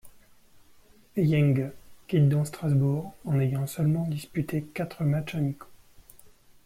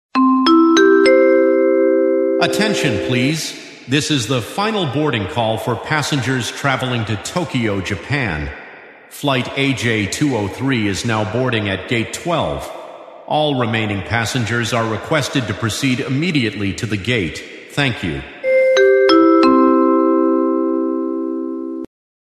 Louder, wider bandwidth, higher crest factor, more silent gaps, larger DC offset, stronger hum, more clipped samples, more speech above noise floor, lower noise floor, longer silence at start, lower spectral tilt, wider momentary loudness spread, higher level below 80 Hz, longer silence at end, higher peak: second, -27 LUFS vs -16 LUFS; first, 15.5 kHz vs 13.5 kHz; about the same, 14 dB vs 16 dB; neither; neither; neither; neither; first, 30 dB vs 20 dB; first, -56 dBFS vs -39 dBFS; about the same, 0.05 s vs 0.15 s; first, -8 dB/octave vs -5 dB/octave; second, 9 LU vs 13 LU; second, -56 dBFS vs -44 dBFS; about the same, 0.35 s vs 0.4 s; second, -14 dBFS vs 0 dBFS